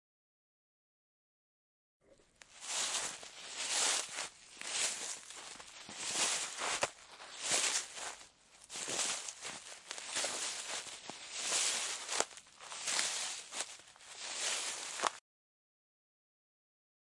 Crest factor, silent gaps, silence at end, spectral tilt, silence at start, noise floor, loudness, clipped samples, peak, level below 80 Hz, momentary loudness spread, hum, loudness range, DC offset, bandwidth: 30 dB; none; 2 s; 1.5 dB/octave; 2.1 s; -64 dBFS; -37 LUFS; under 0.1%; -12 dBFS; -82 dBFS; 15 LU; none; 5 LU; under 0.1%; 12 kHz